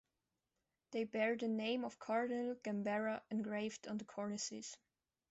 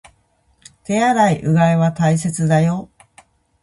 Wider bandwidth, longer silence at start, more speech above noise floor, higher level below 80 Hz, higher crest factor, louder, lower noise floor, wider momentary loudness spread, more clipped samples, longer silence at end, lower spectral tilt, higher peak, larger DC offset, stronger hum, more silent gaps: second, 8.2 kHz vs 11.5 kHz; about the same, 0.9 s vs 0.9 s; first, 49 dB vs 45 dB; second, -84 dBFS vs -52 dBFS; about the same, 18 dB vs 16 dB; second, -42 LUFS vs -16 LUFS; first, -90 dBFS vs -60 dBFS; about the same, 9 LU vs 8 LU; neither; second, 0.55 s vs 0.75 s; second, -4.5 dB/octave vs -6.5 dB/octave; second, -24 dBFS vs -2 dBFS; neither; neither; neither